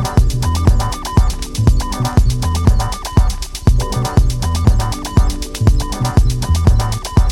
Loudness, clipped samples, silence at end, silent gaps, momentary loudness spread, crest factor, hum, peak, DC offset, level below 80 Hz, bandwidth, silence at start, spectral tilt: -16 LUFS; under 0.1%; 0 s; none; 3 LU; 12 dB; none; 0 dBFS; under 0.1%; -16 dBFS; 17 kHz; 0 s; -6 dB/octave